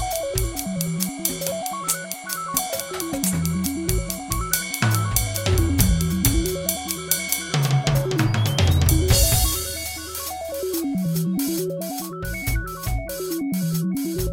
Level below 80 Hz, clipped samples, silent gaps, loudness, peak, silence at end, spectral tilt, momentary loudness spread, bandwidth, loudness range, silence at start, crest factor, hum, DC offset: -30 dBFS; under 0.1%; none; -23 LUFS; 0 dBFS; 0 s; -4 dB/octave; 9 LU; 17 kHz; 6 LU; 0 s; 22 dB; none; under 0.1%